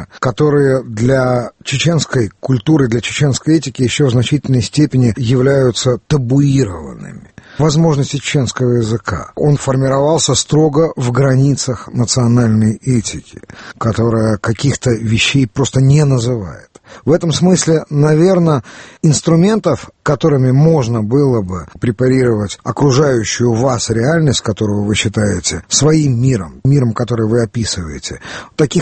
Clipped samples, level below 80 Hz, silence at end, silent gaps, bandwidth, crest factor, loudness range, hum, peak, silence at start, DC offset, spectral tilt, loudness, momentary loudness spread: under 0.1%; -40 dBFS; 0 s; none; 8.8 kHz; 12 dB; 2 LU; none; 0 dBFS; 0 s; under 0.1%; -5.5 dB/octave; -13 LUFS; 8 LU